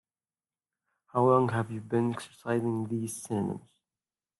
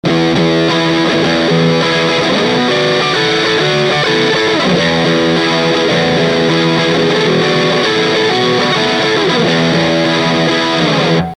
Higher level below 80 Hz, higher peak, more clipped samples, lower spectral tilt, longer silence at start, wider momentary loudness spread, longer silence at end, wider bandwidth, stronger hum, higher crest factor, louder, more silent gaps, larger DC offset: second, -72 dBFS vs -44 dBFS; second, -12 dBFS vs 0 dBFS; neither; first, -7 dB/octave vs -5 dB/octave; first, 1.15 s vs 0.05 s; first, 11 LU vs 1 LU; first, 0.8 s vs 0 s; first, 12.5 kHz vs 10.5 kHz; neither; first, 20 dB vs 12 dB; second, -30 LUFS vs -11 LUFS; neither; neither